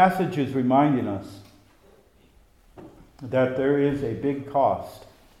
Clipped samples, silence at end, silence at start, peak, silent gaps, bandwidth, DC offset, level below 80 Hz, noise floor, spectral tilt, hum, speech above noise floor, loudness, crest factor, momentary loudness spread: under 0.1%; 0.35 s; 0 s; -6 dBFS; none; 14 kHz; under 0.1%; -56 dBFS; -57 dBFS; -8 dB/octave; none; 34 dB; -24 LUFS; 18 dB; 14 LU